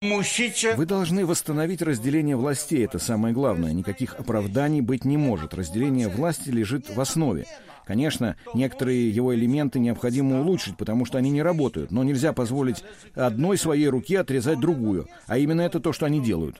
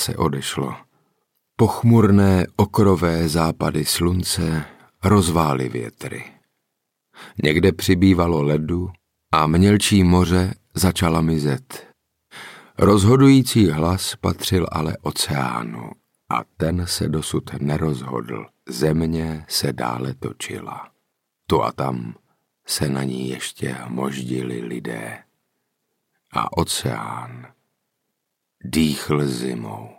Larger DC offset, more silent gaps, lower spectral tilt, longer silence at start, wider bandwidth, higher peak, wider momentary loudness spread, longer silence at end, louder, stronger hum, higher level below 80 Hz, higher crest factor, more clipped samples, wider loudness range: neither; neither; about the same, -5.5 dB/octave vs -5.5 dB/octave; about the same, 0 s vs 0 s; about the same, 16 kHz vs 17 kHz; second, -10 dBFS vs -4 dBFS; second, 5 LU vs 17 LU; about the same, 0.1 s vs 0.05 s; second, -24 LUFS vs -20 LUFS; neither; second, -50 dBFS vs -42 dBFS; about the same, 14 dB vs 16 dB; neither; second, 2 LU vs 9 LU